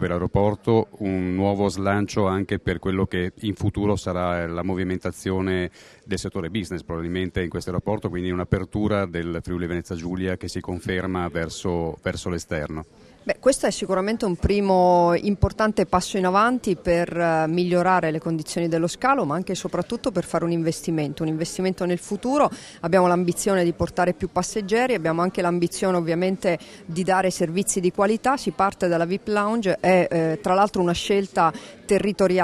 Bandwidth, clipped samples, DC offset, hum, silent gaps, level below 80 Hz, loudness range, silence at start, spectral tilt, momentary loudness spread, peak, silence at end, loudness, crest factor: 13.5 kHz; under 0.1%; under 0.1%; none; none; -44 dBFS; 7 LU; 0 s; -5.5 dB/octave; 8 LU; -4 dBFS; 0 s; -23 LUFS; 18 dB